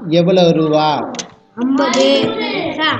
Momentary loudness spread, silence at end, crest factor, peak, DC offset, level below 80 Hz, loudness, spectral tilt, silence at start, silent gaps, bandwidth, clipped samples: 12 LU; 0 s; 14 dB; 0 dBFS; under 0.1%; -54 dBFS; -14 LUFS; -5 dB/octave; 0 s; none; 8.6 kHz; under 0.1%